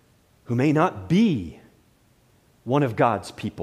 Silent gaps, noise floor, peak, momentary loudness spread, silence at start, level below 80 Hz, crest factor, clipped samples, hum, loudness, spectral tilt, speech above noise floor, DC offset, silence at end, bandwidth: none; -60 dBFS; -6 dBFS; 12 LU; 0.5 s; -56 dBFS; 18 dB; under 0.1%; none; -23 LUFS; -7.5 dB/octave; 38 dB; under 0.1%; 0 s; 13.5 kHz